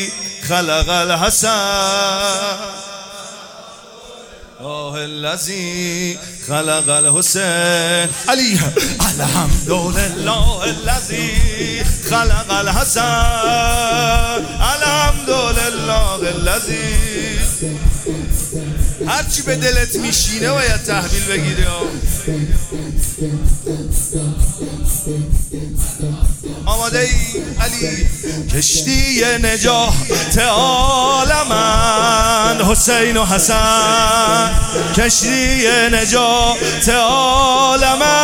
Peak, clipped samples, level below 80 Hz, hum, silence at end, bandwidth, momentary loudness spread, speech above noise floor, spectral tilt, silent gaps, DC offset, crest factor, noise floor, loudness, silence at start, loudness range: 0 dBFS; under 0.1%; -22 dBFS; none; 0 s; 17.5 kHz; 9 LU; 22 dB; -3 dB/octave; none; under 0.1%; 14 dB; -37 dBFS; -15 LUFS; 0 s; 8 LU